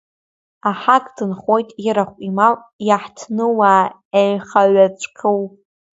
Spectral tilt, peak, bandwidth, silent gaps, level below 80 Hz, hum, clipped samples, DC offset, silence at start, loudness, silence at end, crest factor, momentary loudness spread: -5.5 dB/octave; 0 dBFS; 8 kHz; 2.73-2.79 s, 4.05-4.11 s; -66 dBFS; none; under 0.1%; under 0.1%; 0.65 s; -17 LUFS; 0.45 s; 16 dB; 10 LU